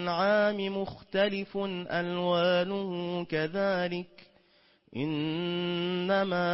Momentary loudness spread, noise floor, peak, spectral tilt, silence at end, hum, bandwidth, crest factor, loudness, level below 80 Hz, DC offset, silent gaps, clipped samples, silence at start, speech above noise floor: 8 LU; -65 dBFS; -16 dBFS; -9.5 dB/octave; 0 s; none; 5.8 kHz; 14 dB; -30 LUFS; -68 dBFS; under 0.1%; none; under 0.1%; 0 s; 35 dB